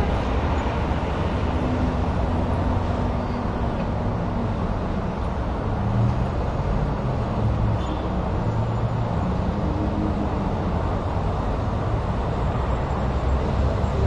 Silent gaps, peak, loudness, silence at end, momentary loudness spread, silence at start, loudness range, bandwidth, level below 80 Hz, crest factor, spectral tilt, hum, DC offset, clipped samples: none; -10 dBFS; -25 LUFS; 0 s; 3 LU; 0 s; 1 LU; 8.6 kHz; -28 dBFS; 14 dB; -8.5 dB/octave; none; under 0.1%; under 0.1%